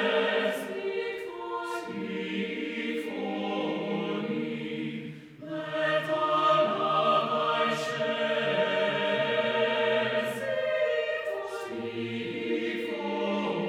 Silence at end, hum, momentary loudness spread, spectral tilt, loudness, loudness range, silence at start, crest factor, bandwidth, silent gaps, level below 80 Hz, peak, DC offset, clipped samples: 0 s; none; 10 LU; -5 dB/octave; -29 LUFS; 7 LU; 0 s; 16 dB; 15 kHz; none; -74 dBFS; -14 dBFS; under 0.1%; under 0.1%